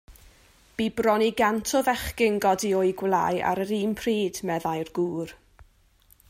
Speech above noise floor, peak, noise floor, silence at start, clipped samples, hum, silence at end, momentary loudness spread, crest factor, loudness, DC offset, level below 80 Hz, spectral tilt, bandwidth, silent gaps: 35 dB; -10 dBFS; -60 dBFS; 0.1 s; under 0.1%; none; 0.65 s; 7 LU; 16 dB; -25 LUFS; under 0.1%; -52 dBFS; -4.5 dB/octave; 16 kHz; none